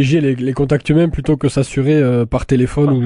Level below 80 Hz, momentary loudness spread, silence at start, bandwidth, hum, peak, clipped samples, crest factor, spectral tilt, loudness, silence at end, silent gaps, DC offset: -32 dBFS; 3 LU; 0 s; 11 kHz; none; -2 dBFS; under 0.1%; 12 dB; -7.5 dB/octave; -15 LUFS; 0 s; none; under 0.1%